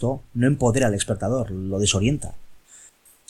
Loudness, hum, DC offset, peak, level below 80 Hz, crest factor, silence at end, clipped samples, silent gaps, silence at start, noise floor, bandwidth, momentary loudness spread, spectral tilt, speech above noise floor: -22 LUFS; none; under 0.1%; -6 dBFS; -42 dBFS; 18 dB; 0.4 s; under 0.1%; none; 0 s; -52 dBFS; 13.5 kHz; 7 LU; -5 dB/octave; 30 dB